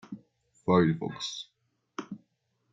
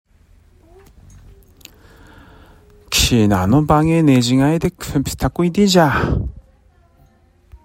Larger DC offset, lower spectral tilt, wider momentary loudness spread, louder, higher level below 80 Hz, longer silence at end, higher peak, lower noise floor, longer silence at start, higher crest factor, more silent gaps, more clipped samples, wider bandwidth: neither; about the same, -6 dB/octave vs -5.5 dB/octave; first, 23 LU vs 8 LU; second, -28 LUFS vs -15 LUFS; second, -68 dBFS vs -34 dBFS; second, 0.55 s vs 1.25 s; second, -10 dBFS vs -2 dBFS; first, -75 dBFS vs -52 dBFS; second, 0.1 s vs 2.9 s; first, 22 dB vs 16 dB; neither; neither; second, 7.8 kHz vs 16.5 kHz